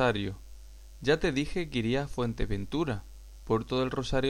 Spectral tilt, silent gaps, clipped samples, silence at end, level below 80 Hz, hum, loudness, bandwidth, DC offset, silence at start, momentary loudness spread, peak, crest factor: -6 dB/octave; none; under 0.1%; 0 s; -42 dBFS; none; -31 LUFS; 16 kHz; under 0.1%; 0 s; 11 LU; -12 dBFS; 18 dB